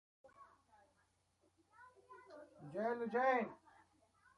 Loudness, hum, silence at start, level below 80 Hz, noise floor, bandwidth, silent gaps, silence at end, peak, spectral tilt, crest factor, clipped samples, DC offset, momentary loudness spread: -39 LUFS; none; 0.25 s; -86 dBFS; -79 dBFS; 11 kHz; none; 0.8 s; -26 dBFS; -6.5 dB/octave; 20 dB; under 0.1%; under 0.1%; 26 LU